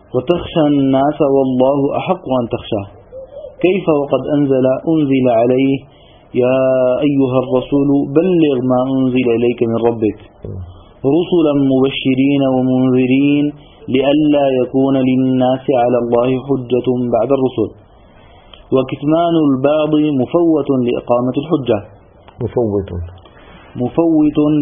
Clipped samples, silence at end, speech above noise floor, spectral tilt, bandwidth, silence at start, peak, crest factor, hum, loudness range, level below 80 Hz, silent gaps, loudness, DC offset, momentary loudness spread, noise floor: under 0.1%; 0 s; 29 dB; -11.5 dB/octave; 3.7 kHz; 0.15 s; 0 dBFS; 14 dB; none; 3 LU; -44 dBFS; none; -14 LUFS; under 0.1%; 9 LU; -43 dBFS